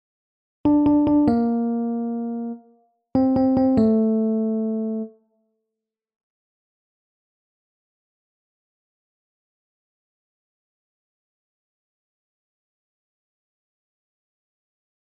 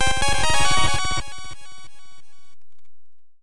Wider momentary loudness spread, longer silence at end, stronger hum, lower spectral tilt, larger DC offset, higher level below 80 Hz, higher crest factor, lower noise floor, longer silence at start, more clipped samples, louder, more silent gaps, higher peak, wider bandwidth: second, 12 LU vs 20 LU; first, 9.95 s vs 0 s; neither; first, -11 dB/octave vs -2 dB/octave; neither; second, -54 dBFS vs -36 dBFS; about the same, 18 dB vs 16 dB; first, -85 dBFS vs -59 dBFS; first, 0.65 s vs 0 s; neither; about the same, -21 LUFS vs -21 LUFS; neither; second, -8 dBFS vs -4 dBFS; second, 5.2 kHz vs 11.5 kHz